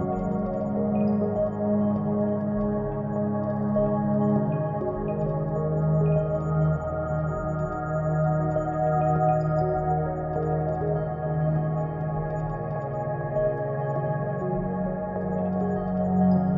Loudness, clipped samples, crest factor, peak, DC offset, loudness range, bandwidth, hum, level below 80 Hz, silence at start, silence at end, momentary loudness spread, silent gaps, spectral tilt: -26 LUFS; under 0.1%; 14 dB; -12 dBFS; under 0.1%; 3 LU; 6.6 kHz; none; -44 dBFS; 0 s; 0 s; 6 LU; none; -11.5 dB/octave